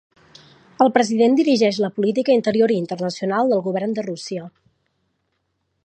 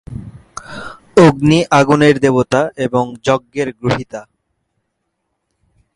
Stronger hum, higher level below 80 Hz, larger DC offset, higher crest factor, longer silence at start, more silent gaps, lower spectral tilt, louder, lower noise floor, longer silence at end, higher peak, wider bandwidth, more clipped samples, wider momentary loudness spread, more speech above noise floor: neither; second, -70 dBFS vs -44 dBFS; neither; about the same, 18 dB vs 16 dB; first, 0.8 s vs 0.1 s; neither; about the same, -5.5 dB/octave vs -6 dB/octave; second, -19 LUFS vs -13 LUFS; about the same, -72 dBFS vs -71 dBFS; second, 1.35 s vs 1.75 s; about the same, -2 dBFS vs 0 dBFS; second, 9.6 kHz vs 11.5 kHz; neither; second, 10 LU vs 21 LU; second, 53 dB vs 58 dB